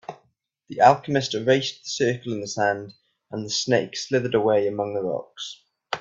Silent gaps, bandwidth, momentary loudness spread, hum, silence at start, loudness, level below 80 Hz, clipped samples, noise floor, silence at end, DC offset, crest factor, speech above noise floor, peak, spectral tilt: none; 8 kHz; 17 LU; none; 0.1 s; -23 LUFS; -66 dBFS; under 0.1%; -68 dBFS; 0 s; under 0.1%; 22 dB; 45 dB; -2 dBFS; -4.5 dB/octave